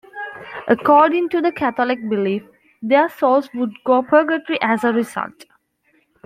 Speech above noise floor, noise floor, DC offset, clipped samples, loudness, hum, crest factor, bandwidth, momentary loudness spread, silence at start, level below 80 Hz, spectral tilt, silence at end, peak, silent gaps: 45 dB; -62 dBFS; under 0.1%; under 0.1%; -18 LUFS; none; 16 dB; 15.5 kHz; 16 LU; 0.15 s; -64 dBFS; -6 dB/octave; 0.85 s; -2 dBFS; none